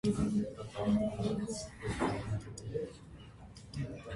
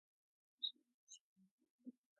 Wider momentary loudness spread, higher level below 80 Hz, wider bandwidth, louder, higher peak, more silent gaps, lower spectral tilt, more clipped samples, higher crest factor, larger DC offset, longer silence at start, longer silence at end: first, 20 LU vs 16 LU; first, -52 dBFS vs under -90 dBFS; first, 11.5 kHz vs 6.6 kHz; first, -37 LUFS vs -47 LUFS; first, -20 dBFS vs -32 dBFS; second, none vs 0.94-1.07 s, 1.21-1.36 s, 1.51-1.58 s, 1.70-1.79 s; first, -6.5 dB/octave vs -1.5 dB/octave; neither; second, 16 dB vs 26 dB; neither; second, 0.05 s vs 0.6 s; second, 0 s vs 0.3 s